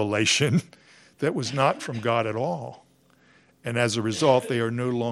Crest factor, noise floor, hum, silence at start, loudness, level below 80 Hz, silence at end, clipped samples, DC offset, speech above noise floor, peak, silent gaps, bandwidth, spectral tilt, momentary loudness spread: 20 dB; -60 dBFS; none; 0 s; -24 LUFS; -68 dBFS; 0 s; under 0.1%; under 0.1%; 35 dB; -6 dBFS; none; 13 kHz; -4.5 dB/octave; 9 LU